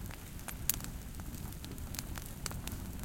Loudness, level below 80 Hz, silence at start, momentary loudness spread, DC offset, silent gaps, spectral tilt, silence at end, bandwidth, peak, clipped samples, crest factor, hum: -41 LUFS; -48 dBFS; 0 s; 10 LU; under 0.1%; none; -3.5 dB/octave; 0 s; 17 kHz; -8 dBFS; under 0.1%; 32 dB; none